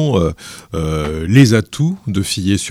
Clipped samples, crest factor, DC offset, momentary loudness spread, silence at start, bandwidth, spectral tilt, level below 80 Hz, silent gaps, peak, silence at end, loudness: under 0.1%; 14 dB; under 0.1%; 12 LU; 0 s; 15.5 kHz; -6 dB/octave; -34 dBFS; none; 0 dBFS; 0 s; -15 LUFS